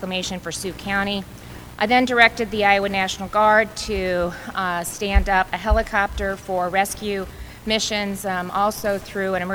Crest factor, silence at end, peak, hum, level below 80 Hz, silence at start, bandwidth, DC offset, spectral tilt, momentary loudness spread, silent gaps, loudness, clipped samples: 22 dB; 0 s; 0 dBFS; none; -32 dBFS; 0 s; over 20 kHz; under 0.1%; -4 dB/octave; 11 LU; none; -21 LUFS; under 0.1%